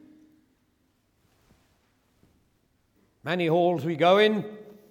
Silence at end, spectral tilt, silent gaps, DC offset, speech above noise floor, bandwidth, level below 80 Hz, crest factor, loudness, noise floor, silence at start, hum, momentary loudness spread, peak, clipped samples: 0.2 s; -6.5 dB/octave; none; under 0.1%; 47 dB; 16.5 kHz; -74 dBFS; 20 dB; -23 LUFS; -69 dBFS; 3.25 s; none; 21 LU; -8 dBFS; under 0.1%